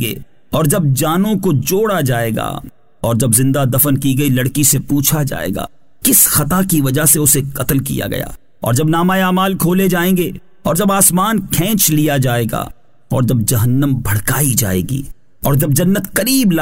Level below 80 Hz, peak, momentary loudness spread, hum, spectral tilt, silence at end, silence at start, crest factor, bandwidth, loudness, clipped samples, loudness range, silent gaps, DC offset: -36 dBFS; 0 dBFS; 12 LU; none; -4.5 dB/octave; 0 s; 0 s; 14 dB; 16.5 kHz; -14 LUFS; under 0.1%; 3 LU; none; 2%